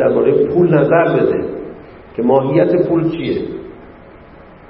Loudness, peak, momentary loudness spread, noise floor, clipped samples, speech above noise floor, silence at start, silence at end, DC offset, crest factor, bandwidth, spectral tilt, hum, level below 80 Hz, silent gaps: -14 LUFS; 0 dBFS; 17 LU; -39 dBFS; under 0.1%; 26 dB; 0 s; 0.5 s; under 0.1%; 16 dB; 5.4 kHz; -12.5 dB/octave; none; -46 dBFS; none